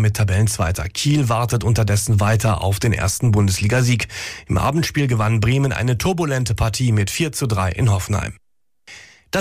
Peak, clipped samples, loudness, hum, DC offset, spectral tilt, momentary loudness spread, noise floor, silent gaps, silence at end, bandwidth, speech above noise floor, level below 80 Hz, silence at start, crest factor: -8 dBFS; under 0.1%; -19 LUFS; none; under 0.1%; -5 dB/octave; 4 LU; -49 dBFS; none; 0 s; 15.5 kHz; 31 dB; -36 dBFS; 0 s; 10 dB